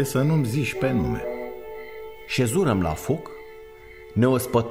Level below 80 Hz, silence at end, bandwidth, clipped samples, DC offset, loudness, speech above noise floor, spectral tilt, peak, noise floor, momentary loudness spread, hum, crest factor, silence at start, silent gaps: -46 dBFS; 0 s; 16 kHz; under 0.1%; 0.5%; -24 LUFS; 22 dB; -6 dB/octave; -8 dBFS; -44 dBFS; 20 LU; none; 18 dB; 0 s; none